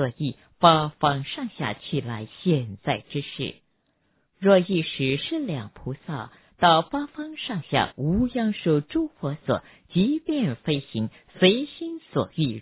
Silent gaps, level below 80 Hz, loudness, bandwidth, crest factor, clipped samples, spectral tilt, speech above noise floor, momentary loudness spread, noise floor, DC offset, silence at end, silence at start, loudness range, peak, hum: none; -52 dBFS; -25 LUFS; 4 kHz; 22 dB; under 0.1%; -10.5 dB/octave; 45 dB; 14 LU; -69 dBFS; under 0.1%; 0 s; 0 s; 2 LU; -2 dBFS; none